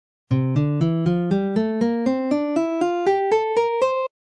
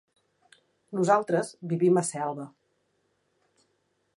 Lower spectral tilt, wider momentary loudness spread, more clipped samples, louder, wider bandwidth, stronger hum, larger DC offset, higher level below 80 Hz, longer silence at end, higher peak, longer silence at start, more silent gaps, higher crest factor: first, -8 dB/octave vs -6 dB/octave; second, 2 LU vs 14 LU; neither; first, -21 LUFS vs -26 LUFS; second, 10 kHz vs 11.5 kHz; neither; neither; first, -54 dBFS vs -80 dBFS; second, 0.25 s vs 1.7 s; about the same, -8 dBFS vs -8 dBFS; second, 0.3 s vs 0.9 s; neither; second, 12 dB vs 22 dB